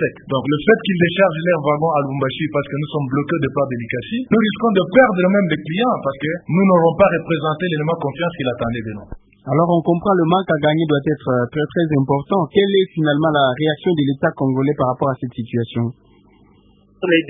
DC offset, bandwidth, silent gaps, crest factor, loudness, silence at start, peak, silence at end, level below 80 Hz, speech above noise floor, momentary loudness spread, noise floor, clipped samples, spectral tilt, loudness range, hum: under 0.1%; 3.8 kHz; none; 18 dB; -18 LUFS; 0 s; 0 dBFS; 0 s; -50 dBFS; 35 dB; 9 LU; -52 dBFS; under 0.1%; -12 dB/octave; 3 LU; none